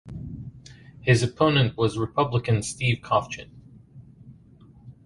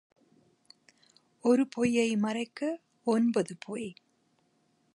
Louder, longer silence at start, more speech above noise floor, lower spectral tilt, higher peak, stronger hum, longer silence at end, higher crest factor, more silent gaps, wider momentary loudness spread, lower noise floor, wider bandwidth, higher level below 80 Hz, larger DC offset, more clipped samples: first, -23 LUFS vs -30 LUFS; second, 0.05 s vs 1.45 s; second, 28 dB vs 43 dB; about the same, -5.5 dB/octave vs -5.5 dB/octave; first, -6 dBFS vs -14 dBFS; neither; second, 0.15 s vs 1 s; about the same, 20 dB vs 18 dB; neither; first, 17 LU vs 12 LU; second, -51 dBFS vs -72 dBFS; about the same, 11.5 kHz vs 11.5 kHz; first, -50 dBFS vs -74 dBFS; neither; neither